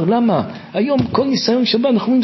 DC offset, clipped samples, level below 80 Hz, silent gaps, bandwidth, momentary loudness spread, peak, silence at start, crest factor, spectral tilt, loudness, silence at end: under 0.1%; under 0.1%; -48 dBFS; none; 6.2 kHz; 6 LU; -2 dBFS; 0 s; 12 dB; -6 dB/octave; -16 LUFS; 0 s